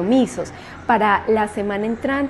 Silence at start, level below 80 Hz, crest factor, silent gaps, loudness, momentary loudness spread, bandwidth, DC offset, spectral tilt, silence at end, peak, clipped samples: 0 s; -48 dBFS; 16 dB; none; -20 LUFS; 13 LU; 12 kHz; under 0.1%; -5.5 dB/octave; 0 s; -4 dBFS; under 0.1%